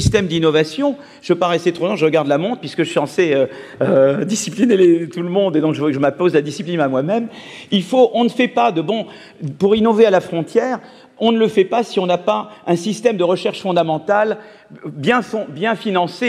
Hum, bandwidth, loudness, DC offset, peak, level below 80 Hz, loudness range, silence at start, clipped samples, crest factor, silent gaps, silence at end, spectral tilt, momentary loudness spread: none; 13 kHz; -17 LUFS; under 0.1%; 0 dBFS; -46 dBFS; 3 LU; 0 s; under 0.1%; 16 dB; none; 0 s; -5.5 dB/octave; 9 LU